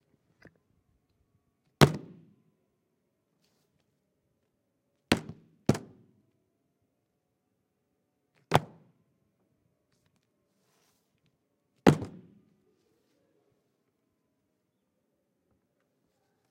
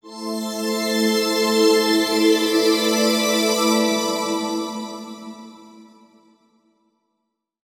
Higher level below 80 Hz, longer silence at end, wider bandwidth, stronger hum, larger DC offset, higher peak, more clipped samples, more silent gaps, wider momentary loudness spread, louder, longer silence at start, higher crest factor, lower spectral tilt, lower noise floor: first, -62 dBFS vs -72 dBFS; first, 4.4 s vs 1.85 s; second, 16 kHz vs 19.5 kHz; neither; neither; about the same, -6 dBFS vs -4 dBFS; neither; neither; about the same, 15 LU vs 16 LU; second, -28 LUFS vs -19 LUFS; first, 1.8 s vs 0.05 s; first, 32 dB vs 16 dB; first, -6 dB/octave vs -2.5 dB/octave; about the same, -79 dBFS vs -77 dBFS